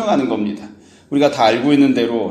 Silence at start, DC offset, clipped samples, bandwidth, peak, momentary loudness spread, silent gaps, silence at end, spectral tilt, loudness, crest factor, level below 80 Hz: 0 s; under 0.1%; under 0.1%; 9.4 kHz; 0 dBFS; 10 LU; none; 0 s; -6 dB/octave; -16 LUFS; 14 dB; -60 dBFS